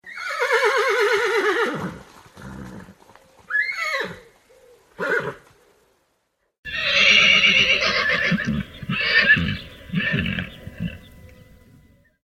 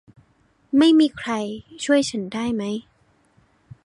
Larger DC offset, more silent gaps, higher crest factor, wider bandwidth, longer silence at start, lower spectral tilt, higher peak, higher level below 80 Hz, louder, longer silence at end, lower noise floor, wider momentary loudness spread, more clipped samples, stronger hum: neither; first, 6.58-6.63 s vs none; about the same, 20 dB vs 16 dB; first, 16.5 kHz vs 11 kHz; second, 0.05 s vs 0.75 s; about the same, -3.5 dB/octave vs -4.5 dB/octave; about the same, -4 dBFS vs -6 dBFS; first, -48 dBFS vs -60 dBFS; first, -18 LUFS vs -21 LUFS; first, 1.25 s vs 1.05 s; first, -71 dBFS vs -61 dBFS; first, 20 LU vs 14 LU; neither; neither